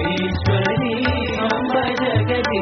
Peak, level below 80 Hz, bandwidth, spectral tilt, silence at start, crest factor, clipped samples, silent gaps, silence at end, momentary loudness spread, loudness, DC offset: -4 dBFS; -40 dBFS; 6.4 kHz; -4.5 dB/octave; 0 s; 14 dB; under 0.1%; none; 0 s; 2 LU; -19 LUFS; under 0.1%